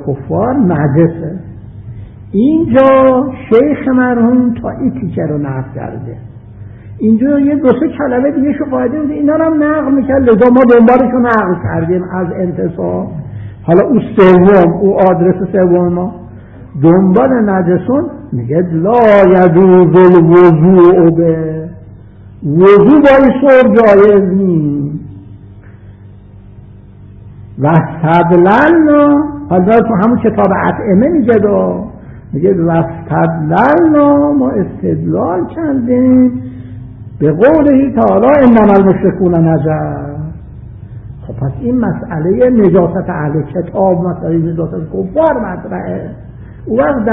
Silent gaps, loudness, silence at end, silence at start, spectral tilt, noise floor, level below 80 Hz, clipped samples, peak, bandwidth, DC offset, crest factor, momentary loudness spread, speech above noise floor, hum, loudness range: none; -9 LUFS; 0 s; 0 s; -11 dB/octave; -34 dBFS; -36 dBFS; 0.4%; 0 dBFS; 4.7 kHz; under 0.1%; 10 dB; 17 LU; 26 dB; none; 7 LU